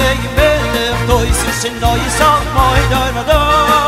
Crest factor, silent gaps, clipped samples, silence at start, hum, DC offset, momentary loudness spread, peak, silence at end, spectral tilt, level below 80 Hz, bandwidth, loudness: 12 dB; none; under 0.1%; 0 s; none; under 0.1%; 4 LU; 0 dBFS; 0 s; -4 dB/octave; -20 dBFS; 16.5 kHz; -12 LUFS